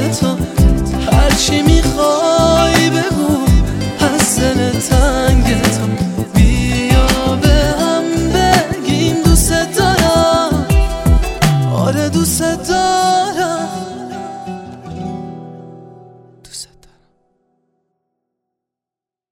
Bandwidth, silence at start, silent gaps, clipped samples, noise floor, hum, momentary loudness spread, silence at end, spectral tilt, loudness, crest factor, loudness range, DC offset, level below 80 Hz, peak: 17 kHz; 0 s; none; under 0.1%; -87 dBFS; none; 15 LU; 2.7 s; -5 dB/octave; -13 LUFS; 14 dB; 15 LU; under 0.1%; -20 dBFS; 0 dBFS